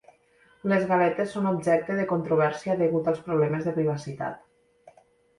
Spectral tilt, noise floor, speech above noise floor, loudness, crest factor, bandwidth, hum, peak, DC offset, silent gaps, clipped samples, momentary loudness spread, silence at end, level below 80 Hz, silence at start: -7.5 dB/octave; -61 dBFS; 36 dB; -26 LUFS; 16 dB; 11.5 kHz; none; -10 dBFS; under 0.1%; none; under 0.1%; 11 LU; 0.5 s; -64 dBFS; 0.65 s